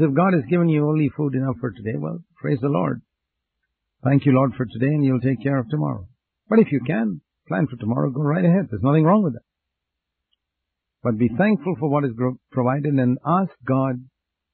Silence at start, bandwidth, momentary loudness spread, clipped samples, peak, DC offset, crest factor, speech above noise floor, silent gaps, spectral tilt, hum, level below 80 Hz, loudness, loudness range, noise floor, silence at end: 0 s; 4.3 kHz; 10 LU; under 0.1%; -4 dBFS; under 0.1%; 18 dB; 62 dB; none; -13.5 dB/octave; none; -54 dBFS; -21 LUFS; 3 LU; -82 dBFS; 0.5 s